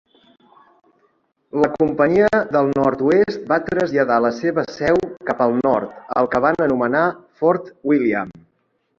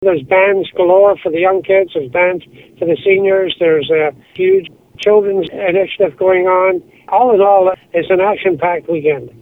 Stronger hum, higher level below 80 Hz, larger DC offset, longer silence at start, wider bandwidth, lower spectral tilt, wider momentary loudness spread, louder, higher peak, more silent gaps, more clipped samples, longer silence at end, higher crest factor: neither; about the same, -54 dBFS vs -54 dBFS; neither; first, 1.55 s vs 0 s; first, 7.4 kHz vs 6.4 kHz; about the same, -7.5 dB/octave vs -7 dB/octave; about the same, 6 LU vs 7 LU; second, -18 LUFS vs -13 LUFS; about the same, -2 dBFS vs 0 dBFS; neither; neither; first, 0.7 s vs 0.1 s; first, 18 dB vs 12 dB